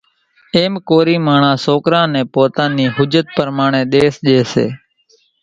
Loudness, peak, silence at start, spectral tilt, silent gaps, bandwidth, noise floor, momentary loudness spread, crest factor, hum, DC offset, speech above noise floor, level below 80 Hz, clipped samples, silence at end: -14 LUFS; 0 dBFS; 0.55 s; -6.5 dB/octave; none; 9.2 kHz; -55 dBFS; 5 LU; 14 dB; none; under 0.1%; 42 dB; -52 dBFS; under 0.1%; 0.65 s